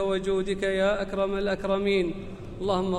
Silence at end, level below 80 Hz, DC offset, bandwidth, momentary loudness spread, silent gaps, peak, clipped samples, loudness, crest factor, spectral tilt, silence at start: 0 s; -44 dBFS; under 0.1%; 11 kHz; 8 LU; none; -14 dBFS; under 0.1%; -27 LUFS; 14 dB; -6 dB/octave; 0 s